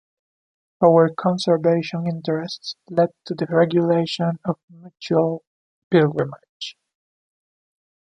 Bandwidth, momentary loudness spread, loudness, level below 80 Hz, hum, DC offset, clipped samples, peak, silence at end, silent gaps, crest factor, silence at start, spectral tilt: 9.8 kHz; 15 LU; -20 LUFS; -66 dBFS; none; under 0.1%; under 0.1%; -2 dBFS; 1.35 s; 4.64-4.68 s, 5.47-5.91 s, 6.49-6.60 s; 20 dB; 0.8 s; -7 dB/octave